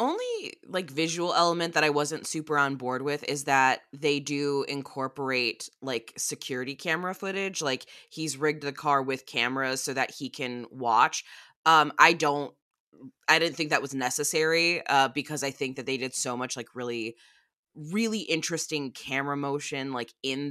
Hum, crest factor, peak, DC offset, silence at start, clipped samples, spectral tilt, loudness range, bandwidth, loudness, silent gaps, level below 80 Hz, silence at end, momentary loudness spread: none; 26 dB; -2 dBFS; under 0.1%; 0 s; under 0.1%; -3 dB/octave; 7 LU; 15 kHz; -27 LUFS; 11.56-11.64 s, 12.62-12.71 s, 12.80-12.92 s, 17.57-17.63 s; -80 dBFS; 0 s; 11 LU